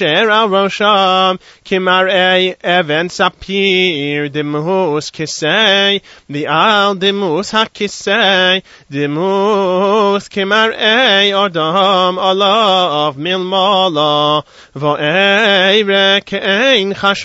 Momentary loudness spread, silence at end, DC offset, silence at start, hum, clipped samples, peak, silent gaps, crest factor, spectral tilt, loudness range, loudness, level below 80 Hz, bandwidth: 8 LU; 0 s; under 0.1%; 0 s; none; under 0.1%; 0 dBFS; none; 12 dB; -4 dB/octave; 2 LU; -12 LUFS; -54 dBFS; 8 kHz